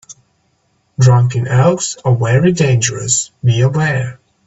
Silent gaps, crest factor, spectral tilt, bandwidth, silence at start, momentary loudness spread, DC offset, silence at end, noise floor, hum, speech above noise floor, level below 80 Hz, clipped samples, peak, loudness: none; 14 dB; -5 dB/octave; 8.4 kHz; 0.1 s; 6 LU; under 0.1%; 0.35 s; -60 dBFS; none; 48 dB; -46 dBFS; under 0.1%; 0 dBFS; -13 LUFS